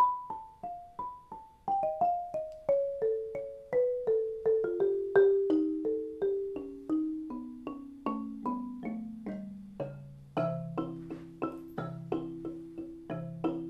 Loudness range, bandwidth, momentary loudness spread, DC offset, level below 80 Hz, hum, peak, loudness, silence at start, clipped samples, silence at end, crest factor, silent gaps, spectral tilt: 9 LU; 5.4 kHz; 14 LU; under 0.1%; -64 dBFS; none; -14 dBFS; -34 LUFS; 0 s; under 0.1%; 0 s; 20 dB; none; -9 dB/octave